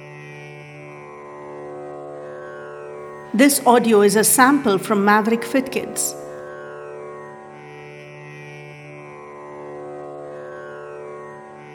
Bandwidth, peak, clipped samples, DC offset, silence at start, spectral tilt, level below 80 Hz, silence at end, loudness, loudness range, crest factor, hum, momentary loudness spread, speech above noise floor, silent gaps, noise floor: over 20 kHz; 0 dBFS; under 0.1%; under 0.1%; 0 s; -3.5 dB/octave; -66 dBFS; 0 s; -16 LUFS; 20 LU; 22 dB; none; 24 LU; 23 dB; none; -38 dBFS